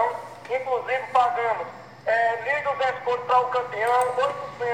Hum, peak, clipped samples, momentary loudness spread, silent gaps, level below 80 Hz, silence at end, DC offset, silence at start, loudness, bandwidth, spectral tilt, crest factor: none; -6 dBFS; under 0.1%; 9 LU; none; -68 dBFS; 0 s; under 0.1%; 0 s; -24 LUFS; 16 kHz; -3 dB/octave; 18 dB